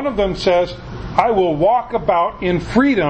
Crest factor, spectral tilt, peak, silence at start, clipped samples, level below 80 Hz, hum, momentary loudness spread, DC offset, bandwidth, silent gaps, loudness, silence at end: 16 dB; -6.5 dB/octave; 0 dBFS; 0 s; under 0.1%; -36 dBFS; none; 6 LU; under 0.1%; 8.6 kHz; none; -17 LUFS; 0 s